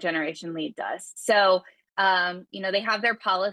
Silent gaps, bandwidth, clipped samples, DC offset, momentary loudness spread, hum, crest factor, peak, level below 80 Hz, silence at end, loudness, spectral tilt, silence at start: none; 12.5 kHz; under 0.1%; under 0.1%; 12 LU; none; 16 dB; -10 dBFS; -78 dBFS; 0 s; -25 LUFS; -3 dB/octave; 0 s